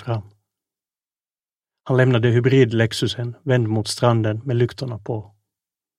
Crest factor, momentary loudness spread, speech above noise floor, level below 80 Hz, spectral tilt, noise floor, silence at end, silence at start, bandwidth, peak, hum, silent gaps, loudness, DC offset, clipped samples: 20 dB; 13 LU; over 71 dB; -58 dBFS; -6.5 dB/octave; under -90 dBFS; 0.75 s; 0 s; 12 kHz; -2 dBFS; none; none; -20 LUFS; under 0.1%; under 0.1%